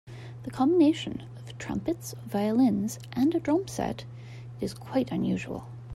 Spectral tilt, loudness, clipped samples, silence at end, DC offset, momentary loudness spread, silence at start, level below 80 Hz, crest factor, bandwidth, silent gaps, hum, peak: -6.5 dB/octave; -28 LUFS; under 0.1%; 0 s; under 0.1%; 17 LU; 0.05 s; -58 dBFS; 16 dB; 14.5 kHz; none; none; -12 dBFS